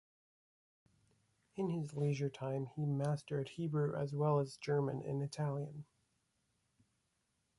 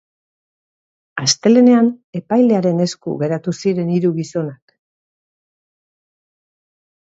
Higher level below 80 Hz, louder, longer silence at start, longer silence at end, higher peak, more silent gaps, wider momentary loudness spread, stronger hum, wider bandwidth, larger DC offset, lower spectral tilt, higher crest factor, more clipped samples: second, -76 dBFS vs -66 dBFS; second, -39 LUFS vs -16 LUFS; first, 1.55 s vs 1.15 s; second, 1.75 s vs 2.65 s; second, -24 dBFS vs 0 dBFS; second, none vs 2.04-2.13 s; second, 7 LU vs 13 LU; neither; first, 11.5 kHz vs 8 kHz; neither; first, -8 dB/octave vs -5.5 dB/octave; about the same, 16 dB vs 18 dB; neither